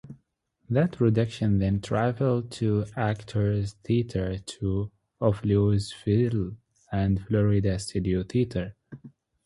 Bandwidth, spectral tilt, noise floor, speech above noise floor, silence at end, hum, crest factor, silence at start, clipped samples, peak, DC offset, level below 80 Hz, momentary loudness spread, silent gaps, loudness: 11.5 kHz; -7.5 dB/octave; -71 dBFS; 46 dB; 0.35 s; none; 18 dB; 0.05 s; under 0.1%; -8 dBFS; under 0.1%; -44 dBFS; 9 LU; none; -27 LUFS